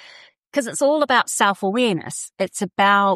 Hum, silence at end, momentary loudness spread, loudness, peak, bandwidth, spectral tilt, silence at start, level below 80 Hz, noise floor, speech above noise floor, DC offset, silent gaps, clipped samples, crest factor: none; 0 s; 10 LU; -20 LUFS; -4 dBFS; 14.5 kHz; -3 dB/octave; 0.55 s; -74 dBFS; -47 dBFS; 28 dB; under 0.1%; none; under 0.1%; 16 dB